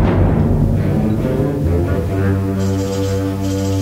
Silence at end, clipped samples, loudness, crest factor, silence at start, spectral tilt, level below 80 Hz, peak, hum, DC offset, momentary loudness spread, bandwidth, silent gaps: 0 s; under 0.1%; -17 LUFS; 14 dB; 0 s; -8 dB/octave; -26 dBFS; -2 dBFS; none; 0.2%; 4 LU; 15.5 kHz; none